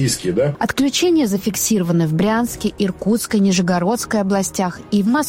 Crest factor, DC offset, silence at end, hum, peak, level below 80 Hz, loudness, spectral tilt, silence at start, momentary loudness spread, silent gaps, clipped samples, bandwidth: 12 dB; under 0.1%; 0 s; none; -6 dBFS; -46 dBFS; -18 LUFS; -5 dB/octave; 0 s; 5 LU; none; under 0.1%; 16.5 kHz